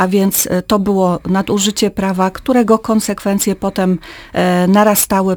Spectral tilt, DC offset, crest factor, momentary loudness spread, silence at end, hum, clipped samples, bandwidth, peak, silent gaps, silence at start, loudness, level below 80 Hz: -5 dB/octave; under 0.1%; 14 dB; 6 LU; 0 s; none; under 0.1%; over 20 kHz; 0 dBFS; none; 0 s; -14 LUFS; -42 dBFS